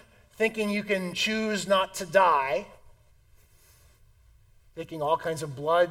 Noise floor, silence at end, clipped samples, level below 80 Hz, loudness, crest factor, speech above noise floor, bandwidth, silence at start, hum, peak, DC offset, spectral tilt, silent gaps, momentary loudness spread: -59 dBFS; 0 s; under 0.1%; -60 dBFS; -26 LUFS; 22 dB; 32 dB; 17 kHz; 0.4 s; none; -6 dBFS; under 0.1%; -4 dB/octave; none; 12 LU